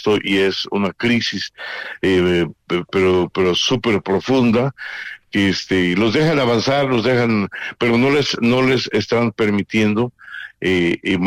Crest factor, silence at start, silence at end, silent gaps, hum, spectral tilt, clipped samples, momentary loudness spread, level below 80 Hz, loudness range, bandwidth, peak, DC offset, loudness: 10 dB; 0 s; 0 s; none; none; -5.5 dB/octave; under 0.1%; 8 LU; -50 dBFS; 2 LU; 14.5 kHz; -8 dBFS; under 0.1%; -17 LUFS